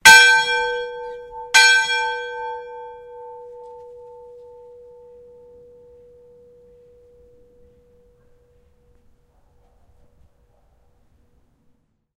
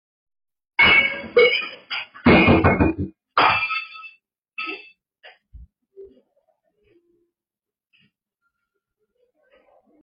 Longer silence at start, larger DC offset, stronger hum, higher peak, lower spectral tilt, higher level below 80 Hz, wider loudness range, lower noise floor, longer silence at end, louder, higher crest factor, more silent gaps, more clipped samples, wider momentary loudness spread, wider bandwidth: second, 0.05 s vs 0.8 s; neither; neither; first, 0 dBFS vs -4 dBFS; second, 1.5 dB/octave vs -8 dB/octave; second, -56 dBFS vs -42 dBFS; first, 27 LU vs 22 LU; second, -62 dBFS vs under -90 dBFS; first, 8.5 s vs 3.95 s; first, -15 LUFS vs -18 LUFS; about the same, 22 dB vs 18 dB; neither; neither; first, 29 LU vs 18 LU; first, 16 kHz vs 5.4 kHz